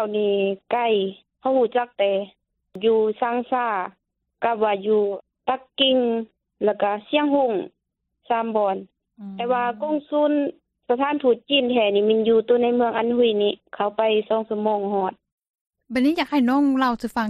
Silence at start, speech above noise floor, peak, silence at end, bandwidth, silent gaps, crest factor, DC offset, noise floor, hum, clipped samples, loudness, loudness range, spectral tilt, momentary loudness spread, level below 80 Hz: 0 s; 55 dB; -6 dBFS; 0 s; 12.5 kHz; 15.32-15.38 s, 15.49-15.54 s, 15.61-15.66 s; 16 dB; under 0.1%; -76 dBFS; none; under 0.1%; -22 LUFS; 4 LU; -6 dB/octave; 9 LU; -64 dBFS